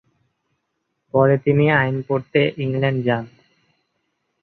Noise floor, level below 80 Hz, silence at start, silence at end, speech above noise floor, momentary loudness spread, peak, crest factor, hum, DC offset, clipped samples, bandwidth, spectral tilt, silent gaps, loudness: -74 dBFS; -56 dBFS; 1.15 s; 1.15 s; 56 dB; 7 LU; -2 dBFS; 18 dB; none; under 0.1%; under 0.1%; 4.6 kHz; -9.5 dB/octave; none; -19 LUFS